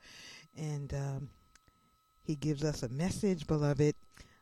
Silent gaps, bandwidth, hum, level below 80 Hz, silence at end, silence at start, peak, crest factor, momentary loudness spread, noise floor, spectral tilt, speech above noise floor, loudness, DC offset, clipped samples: none; 13 kHz; none; -56 dBFS; 0.2 s; 0.05 s; -18 dBFS; 18 dB; 18 LU; -70 dBFS; -6.5 dB/octave; 37 dB; -35 LUFS; under 0.1%; under 0.1%